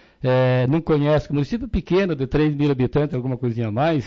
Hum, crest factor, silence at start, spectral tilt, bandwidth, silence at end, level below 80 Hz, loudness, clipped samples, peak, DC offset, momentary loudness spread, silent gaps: none; 12 dB; 0.2 s; -9 dB/octave; 6.6 kHz; 0 s; -38 dBFS; -21 LUFS; under 0.1%; -8 dBFS; under 0.1%; 6 LU; none